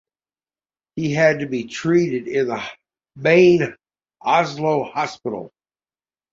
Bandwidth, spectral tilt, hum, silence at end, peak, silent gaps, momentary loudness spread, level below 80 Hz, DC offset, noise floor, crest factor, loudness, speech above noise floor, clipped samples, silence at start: 7.6 kHz; -6 dB/octave; none; 0.85 s; -2 dBFS; none; 15 LU; -60 dBFS; under 0.1%; under -90 dBFS; 18 dB; -19 LUFS; over 72 dB; under 0.1%; 0.95 s